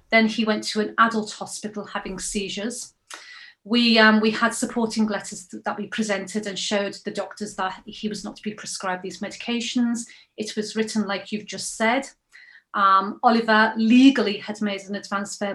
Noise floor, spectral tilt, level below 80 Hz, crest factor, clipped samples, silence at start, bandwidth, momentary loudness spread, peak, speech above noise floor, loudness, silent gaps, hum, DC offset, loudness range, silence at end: -51 dBFS; -3.5 dB/octave; -60 dBFS; 22 dB; under 0.1%; 0.1 s; 12.5 kHz; 15 LU; -2 dBFS; 28 dB; -23 LUFS; none; none; under 0.1%; 8 LU; 0 s